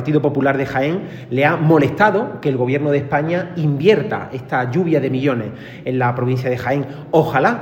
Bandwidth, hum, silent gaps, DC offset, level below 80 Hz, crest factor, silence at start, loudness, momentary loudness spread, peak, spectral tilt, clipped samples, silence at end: 16.5 kHz; none; none; under 0.1%; -54 dBFS; 16 dB; 0 s; -18 LUFS; 9 LU; 0 dBFS; -8 dB/octave; under 0.1%; 0 s